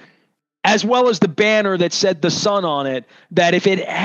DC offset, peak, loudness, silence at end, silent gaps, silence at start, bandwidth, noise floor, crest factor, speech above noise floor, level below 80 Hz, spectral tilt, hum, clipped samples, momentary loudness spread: under 0.1%; 0 dBFS; -17 LUFS; 0 s; none; 0.65 s; 8.6 kHz; -64 dBFS; 16 dB; 47 dB; -68 dBFS; -4 dB/octave; none; under 0.1%; 7 LU